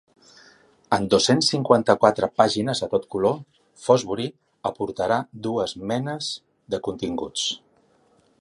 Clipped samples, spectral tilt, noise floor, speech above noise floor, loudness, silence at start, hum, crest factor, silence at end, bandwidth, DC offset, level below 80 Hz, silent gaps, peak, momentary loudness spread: under 0.1%; -4.5 dB/octave; -61 dBFS; 39 dB; -23 LUFS; 0.9 s; none; 22 dB; 0.85 s; 11.5 kHz; under 0.1%; -58 dBFS; none; -2 dBFS; 13 LU